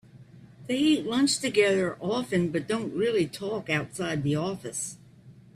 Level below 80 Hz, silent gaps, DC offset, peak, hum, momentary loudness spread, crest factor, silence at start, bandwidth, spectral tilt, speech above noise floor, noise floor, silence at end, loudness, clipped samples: -64 dBFS; none; under 0.1%; -10 dBFS; none; 10 LU; 18 dB; 0.15 s; 14.5 kHz; -4.5 dB/octave; 25 dB; -52 dBFS; 0.25 s; -27 LUFS; under 0.1%